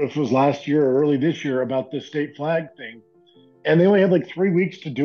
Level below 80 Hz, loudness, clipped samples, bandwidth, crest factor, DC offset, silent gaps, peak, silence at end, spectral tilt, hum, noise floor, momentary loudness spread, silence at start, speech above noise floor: -72 dBFS; -20 LUFS; under 0.1%; 6.8 kHz; 14 dB; under 0.1%; none; -8 dBFS; 0 s; -8 dB/octave; none; -53 dBFS; 12 LU; 0 s; 33 dB